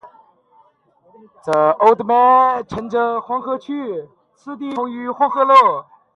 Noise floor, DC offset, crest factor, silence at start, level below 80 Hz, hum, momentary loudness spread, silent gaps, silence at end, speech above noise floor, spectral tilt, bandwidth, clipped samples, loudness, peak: -56 dBFS; under 0.1%; 18 dB; 0.05 s; -58 dBFS; none; 16 LU; none; 0.35 s; 40 dB; -6 dB/octave; 11 kHz; under 0.1%; -16 LUFS; 0 dBFS